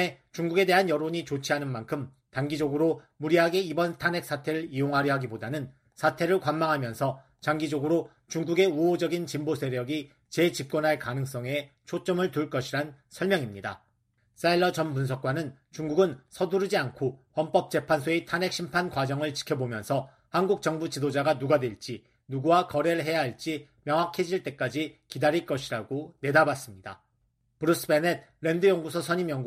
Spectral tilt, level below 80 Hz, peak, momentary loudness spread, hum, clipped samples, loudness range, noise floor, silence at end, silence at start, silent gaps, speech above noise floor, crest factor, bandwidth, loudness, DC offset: -5.5 dB/octave; -66 dBFS; -8 dBFS; 11 LU; none; under 0.1%; 2 LU; -72 dBFS; 0 s; 0 s; none; 45 dB; 20 dB; 14.5 kHz; -28 LUFS; under 0.1%